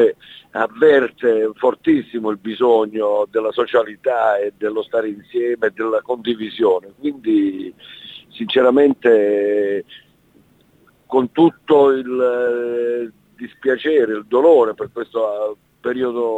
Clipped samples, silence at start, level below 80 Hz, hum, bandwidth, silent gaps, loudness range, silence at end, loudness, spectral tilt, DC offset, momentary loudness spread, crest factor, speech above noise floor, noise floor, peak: under 0.1%; 0 s; -62 dBFS; none; 7.8 kHz; none; 3 LU; 0 s; -17 LUFS; -7 dB/octave; under 0.1%; 13 LU; 14 dB; 38 dB; -54 dBFS; -2 dBFS